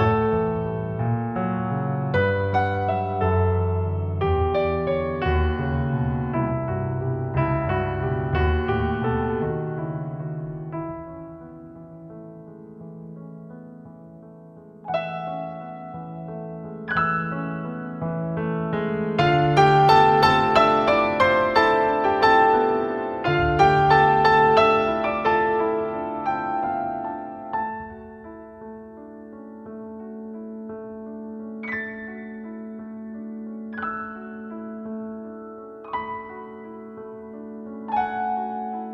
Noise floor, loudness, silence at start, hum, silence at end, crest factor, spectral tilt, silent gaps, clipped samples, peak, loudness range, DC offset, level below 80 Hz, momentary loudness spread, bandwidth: -45 dBFS; -22 LUFS; 0 s; none; 0 s; 20 dB; -7.5 dB/octave; none; under 0.1%; -4 dBFS; 17 LU; under 0.1%; -40 dBFS; 23 LU; 12.5 kHz